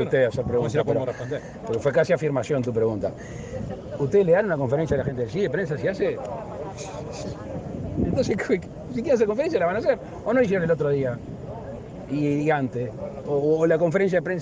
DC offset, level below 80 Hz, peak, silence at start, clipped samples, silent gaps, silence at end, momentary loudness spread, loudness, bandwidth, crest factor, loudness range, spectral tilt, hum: under 0.1%; -48 dBFS; -8 dBFS; 0 s; under 0.1%; none; 0 s; 13 LU; -24 LUFS; 9.4 kHz; 16 dB; 4 LU; -7 dB/octave; none